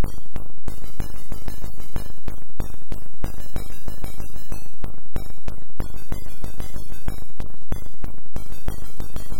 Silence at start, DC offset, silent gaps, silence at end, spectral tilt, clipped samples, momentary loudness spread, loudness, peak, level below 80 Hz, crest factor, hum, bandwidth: 0 s; 30%; none; 0 s; -6 dB/octave; under 0.1%; 5 LU; -37 LUFS; -8 dBFS; -32 dBFS; 12 dB; none; 17 kHz